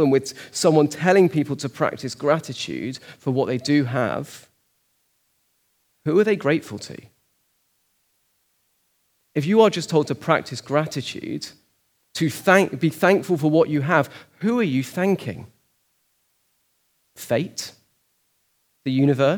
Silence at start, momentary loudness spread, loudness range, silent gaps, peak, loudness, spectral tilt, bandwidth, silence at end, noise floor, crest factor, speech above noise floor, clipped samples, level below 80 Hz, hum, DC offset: 0 s; 15 LU; 8 LU; none; 0 dBFS; -21 LUFS; -6 dB/octave; over 20 kHz; 0 s; -68 dBFS; 22 dB; 48 dB; under 0.1%; -70 dBFS; none; under 0.1%